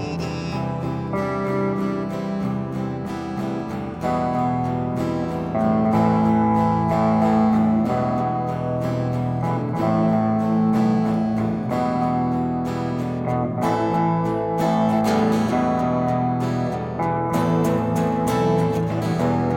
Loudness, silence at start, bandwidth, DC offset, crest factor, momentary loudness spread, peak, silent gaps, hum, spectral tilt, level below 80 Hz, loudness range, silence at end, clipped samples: -22 LUFS; 0 s; 16 kHz; under 0.1%; 14 dB; 8 LU; -6 dBFS; none; none; -8 dB/octave; -46 dBFS; 6 LU; 0 s; under 0.1%